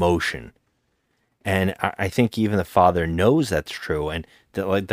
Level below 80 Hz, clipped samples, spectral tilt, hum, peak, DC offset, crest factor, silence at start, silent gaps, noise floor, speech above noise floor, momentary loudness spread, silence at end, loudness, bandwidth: -44 dBFS; under 0.1%; -6 dB/octave; none; -2 dBFS; under 0.1%; 22 dB; 0 s; none; -70 dBFS; 48 dB; 12 LU; 0 s; -22 LUFS; 16 kHz